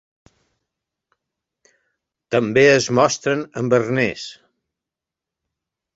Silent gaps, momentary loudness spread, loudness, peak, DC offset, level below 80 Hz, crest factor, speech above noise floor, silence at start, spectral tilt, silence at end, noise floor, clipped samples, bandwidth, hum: none; 9 LU; -18 LUFS; -2 dBFS; under 0.1%; -60 dBFS; 20 dB; 69 dB; 2.3 s; -4.5 dB/octave; 1.65 s; -87 dBFS; under 0.1%; 8 kHz; none